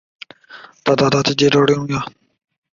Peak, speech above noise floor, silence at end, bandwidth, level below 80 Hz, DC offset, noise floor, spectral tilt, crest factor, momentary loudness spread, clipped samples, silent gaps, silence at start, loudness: -2 dBFS; 27 dB; 0.65 s; 7.4 kHz; -52 dBFS; under 0.1%; -42 dBFS; -5 dB/octave; 16 dB; 14 LU; under 0.1%; none; 0.5 s; -16 LUFS